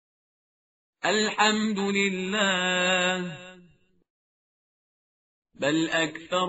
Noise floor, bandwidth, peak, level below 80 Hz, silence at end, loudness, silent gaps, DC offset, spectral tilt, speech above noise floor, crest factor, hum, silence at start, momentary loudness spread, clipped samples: -60 dBFS; 8 kHz; -8 dBFS; -70 dBFS; 0 s; -25 LUFS; 4.10-5.42 s; under 0.1%; -2 dB/octave; 34 dB; 20 dB; none; 1.05 s; 8 LU; under 0.1%